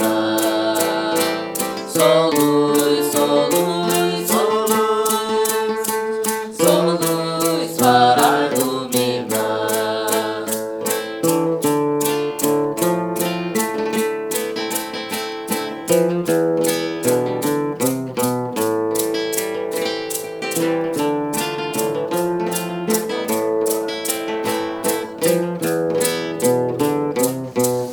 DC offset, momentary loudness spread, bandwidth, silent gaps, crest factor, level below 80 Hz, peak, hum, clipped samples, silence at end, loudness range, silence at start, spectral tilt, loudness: under 0.1%; 7 LU; over 20 kHz; none; 18 dB; -62 dBFS; 0 dBFS; none; under 0.1%; 0 s; 4 LU; 0 s; -4 dB/octave; -19 LUFS